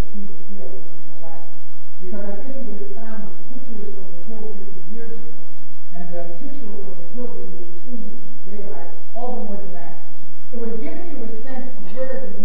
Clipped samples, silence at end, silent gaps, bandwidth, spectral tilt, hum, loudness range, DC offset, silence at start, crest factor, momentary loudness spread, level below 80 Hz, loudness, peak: under 0.1%; 0 s; none; 5.2 kHz; -10 dB/octave; none; 4 LU; 50%; 0 s; 18 dB; 14 LU; -62 dBFS; -36 LUFS; -4 dBFS